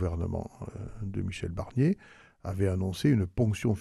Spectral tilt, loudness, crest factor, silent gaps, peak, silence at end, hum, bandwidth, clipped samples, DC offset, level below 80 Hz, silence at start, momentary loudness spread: -7.5 dB/octave; -30 LUFS; 18 dB; none; -12 dBFS; 0 s; none; 13 kHz; under 0.1%; under 0.1%; -48 dBFS; 0 s; 14 LU